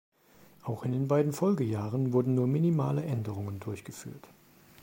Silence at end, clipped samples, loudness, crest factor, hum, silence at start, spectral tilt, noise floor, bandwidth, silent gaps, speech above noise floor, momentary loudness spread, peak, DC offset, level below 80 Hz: 0.55 s; under 0.1%; -30 LUFS; 18 dB; none; 0.65 s; -8.5 dB/octave; -59 dBFS; 16.5 kHz; none; 30 dB; 16 LU; -14 dBFS; under 0.1%; -68 dBFS